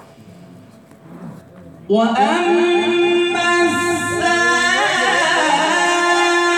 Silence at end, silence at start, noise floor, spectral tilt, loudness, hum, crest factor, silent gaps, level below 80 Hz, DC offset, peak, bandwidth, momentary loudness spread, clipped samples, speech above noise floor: 0 s; 0.2 s; -43 dBFS; -3 dB/octave; -15 LUFS; none; 12 dB; none; -60 dBFS; under 0.1%; -4 dBFS; 13.5 kHz; 4 LU; under 0.1%; 28 dB